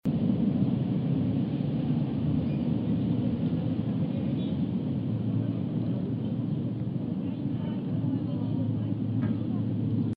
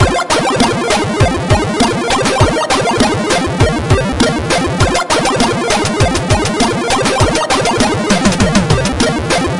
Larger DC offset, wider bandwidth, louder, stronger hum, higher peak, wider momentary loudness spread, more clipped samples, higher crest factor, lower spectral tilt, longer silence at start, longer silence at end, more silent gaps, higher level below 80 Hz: second, under 0.1% vs 0.2%; second, 5 kHz vs 11.5 kHz; second, -29 LUFS vs -12 LUFS; neither; second, -14 dBFS vs 0 dBFS; about the same, 4 LU vs 2 LU; neither; about the same, 14 dB vs 12 dB; first, -11.5 dB/octave vs -4.5 dB/octave; about the same, 0.05 s vs 0 s; about the same, 0 s vs 0 s; neither; second, -54 dBFS vs -26 dBFS